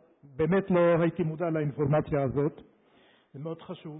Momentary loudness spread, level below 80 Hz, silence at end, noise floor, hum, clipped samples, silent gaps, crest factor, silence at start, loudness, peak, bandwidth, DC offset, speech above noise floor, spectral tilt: 16 LU; -56 dBFS; 0 s; -62 dBFS; none; under 0.1%; none; 12 dB; 0.35 s; -27 LUFS; -16 dBFS; 4 kHz; under 0.1%; 35 dB; -12 dB/octave